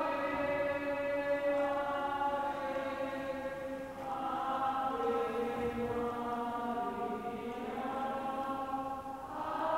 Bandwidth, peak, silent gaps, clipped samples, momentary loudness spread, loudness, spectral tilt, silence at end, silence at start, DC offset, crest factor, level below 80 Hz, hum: 16 kHz; -22 dBFS; none; under 0.1%; 7 LU; -36 LUFS; -5.5 dB/octave; 0 s; 0 s; under 0.1%; 14 dB; -62 dBFS; none